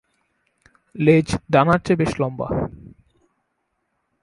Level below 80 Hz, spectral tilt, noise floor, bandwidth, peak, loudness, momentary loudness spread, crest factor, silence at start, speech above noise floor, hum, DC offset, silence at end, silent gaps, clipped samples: -44 dBFS; -7 dB/octave; -73 dBFS; 11.5 kHz; 0 dBFS; -19 LUFS; 10 LU; 22 dB; 0.95 s; 55 dB; none; under 0.1%; 1.55 s; none; under 0.1%